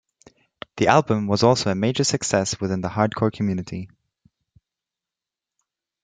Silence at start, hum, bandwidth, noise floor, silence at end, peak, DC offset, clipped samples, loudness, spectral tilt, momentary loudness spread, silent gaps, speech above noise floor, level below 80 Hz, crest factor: 0.75 s; none; 9.6 kHz; -88 dBFS; 2.2 s; -2 dBFS; under 0.1%; under 0.1%; -21 LUFS; -5 dB/octave; 16 LU; none; 68 dB; -58 dBFS; 22 dB